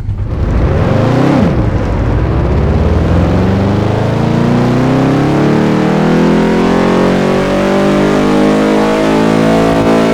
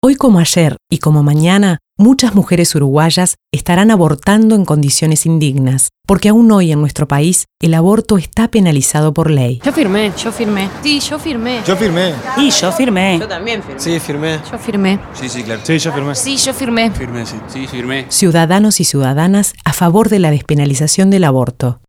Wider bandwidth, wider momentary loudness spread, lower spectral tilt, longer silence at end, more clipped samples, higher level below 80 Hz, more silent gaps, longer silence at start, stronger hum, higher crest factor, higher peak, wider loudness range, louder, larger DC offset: second, 14.5 kHz vs 17 kHz; second, 3 LU vs 9 LU; first, -7.5 dB/octave vs -5 dB/octave; second, 0 s vs 0.15 s; neither; first, -20 dBFS vs -38 dBFS; neither; about the same, 0 s vs 0.05 s; neither; about the same, 10 dB vs 12 dB; about the same, 0 dBFS vs 0 dBFS; second, 2 LU vs 5 LU; about the same, -10 LUFS vs -12 LUFS; neither